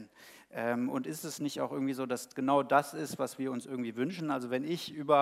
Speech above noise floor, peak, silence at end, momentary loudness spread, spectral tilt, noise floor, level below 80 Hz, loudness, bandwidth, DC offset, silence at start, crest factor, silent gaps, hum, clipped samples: 24 dB; -12 dBFS; 0 s; 9 LU; -5 dB/octave; -56 dBFS; -84 dBFS; -34 LUFS; 16 kHz; under 0.1%; 0 s; 20 dB; none; none; under 0.1%